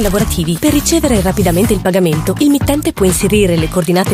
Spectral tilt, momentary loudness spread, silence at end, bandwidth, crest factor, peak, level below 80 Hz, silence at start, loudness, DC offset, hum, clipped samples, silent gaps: -5 dB/octave; 3 LU; 0 s; 16 kHz; 12 dB; 0 dBFS; -26 dBFS; 0 s; -12 LUFS; under 0.1%; none; under 0.1%; none